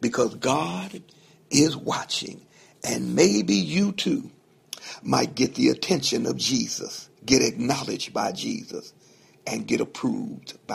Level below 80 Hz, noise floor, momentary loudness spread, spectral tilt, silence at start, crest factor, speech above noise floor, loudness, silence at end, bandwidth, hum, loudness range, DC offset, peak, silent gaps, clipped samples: -58 dBFS; -56 dBFS; 16 LU; -4 dB/octave; 0 s; 24 dB; 31 dB; -24 LUFS; 0 s; 15.5 kHz; none; 3 LU; under 0.1%; -2 dBFS; none; under 0.1%